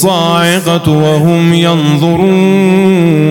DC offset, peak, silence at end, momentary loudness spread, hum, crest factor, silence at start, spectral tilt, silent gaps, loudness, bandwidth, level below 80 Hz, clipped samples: under 0.1%; 0 dBFS; 0 s; 2 LU; none; 8 dB; 0 s; -6 dB/octave; none; -8 LUFS; 17 kHz; -44 dBFS; 0.8%